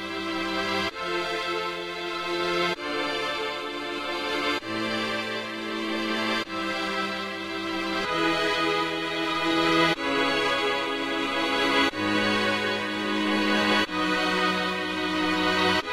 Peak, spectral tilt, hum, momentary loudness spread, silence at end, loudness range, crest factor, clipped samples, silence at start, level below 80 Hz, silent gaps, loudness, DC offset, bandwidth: -10 dBFS; -3.5 dB/octave; none; 8 LU; 0 s; 4 LU; 16 dB; under 0.1%; 0 s; -58 dBFS; none; -26 LUFS; under 0.1%; 16 kHz